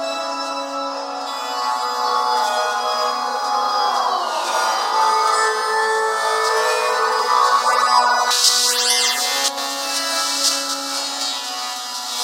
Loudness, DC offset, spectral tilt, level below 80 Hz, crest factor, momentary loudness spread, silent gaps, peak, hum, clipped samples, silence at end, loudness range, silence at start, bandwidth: -18 LUFS; under 0.1%; 3 dB/octave; under -90 dBFS; 18 dB; 10 LU; none; 0 dBFS; none; under 0.1%; 0 s; 5 LU; 0 s; 16 kHz